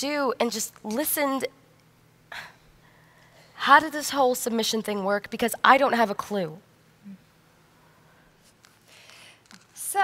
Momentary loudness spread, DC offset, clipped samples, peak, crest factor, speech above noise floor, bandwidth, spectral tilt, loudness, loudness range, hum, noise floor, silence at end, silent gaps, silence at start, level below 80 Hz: 17 LU; under 0.1%; under 0.1%; -2 dBFS; 26 dB; 35 dB; 16 kHz; -2.5 dB/octave; -24 LUFS; 11 LU; none; -59 dBFS; 0 s; none; 0 s; -68 dBFS